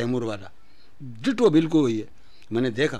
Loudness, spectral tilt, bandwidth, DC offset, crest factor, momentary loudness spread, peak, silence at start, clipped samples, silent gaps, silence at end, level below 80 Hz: -23 LUFS; -6.5 dB/octave; 10.5 kHz; 1%; 18 dB; 23 LU; -6 dBFS; 0 s; under 0.1%; none; 0 s; -60 dBFS